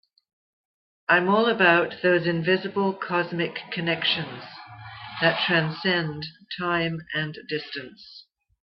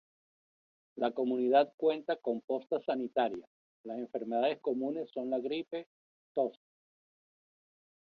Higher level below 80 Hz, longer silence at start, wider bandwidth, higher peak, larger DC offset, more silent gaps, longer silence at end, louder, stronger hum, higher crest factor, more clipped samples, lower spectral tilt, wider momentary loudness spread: first, -66 dBFS vs -82 dBFS; first, 1.1 s vs 0.95 s; first, 5.8 kHz vs 5.2 kHz; first, -4 dBFS vs -14 dBFS; neither; second, none vs 1.74-1.78 s, 2.44-2.48 s, 3.47-3.84 s, 5.86-6.35 s; second, 0.45 s vs 1.6 s; first, -24 LUFS vs -34 LUFS; neither; about the same, 20 dB vs 22 dB; neither; about the same, -8 dB/octave vs -7.5 dB/octave; first, 18 LU vs 14 LU